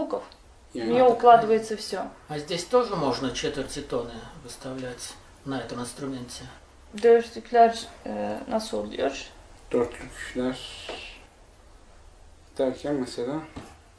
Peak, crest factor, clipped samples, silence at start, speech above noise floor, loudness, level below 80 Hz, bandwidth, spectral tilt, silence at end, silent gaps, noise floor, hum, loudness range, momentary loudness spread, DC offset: -4 dBFS; 24 dB; under 0.1%; 0 s; 27 dB; -26 LUFS; -52 dBFS; 11 kHz; -4.5 dB/octave; 0.25 s; none; -52 dBFS; none; 11 LU; 19 LU; under 0.1%